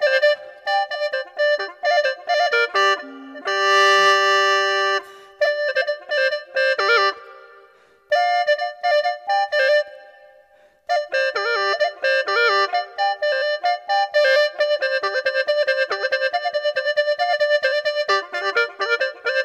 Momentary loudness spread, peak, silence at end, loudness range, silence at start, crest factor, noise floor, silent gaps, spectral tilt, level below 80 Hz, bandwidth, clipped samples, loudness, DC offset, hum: 7 LU; -2 dBFS; 0 s; 4 LU; 0 s; 18 dB; -54 dBFS; none; 0.5 dB/octave; -76 dBFS; 14.5 kHz; under 0.1%; -19 LUFS; under 0.1%; none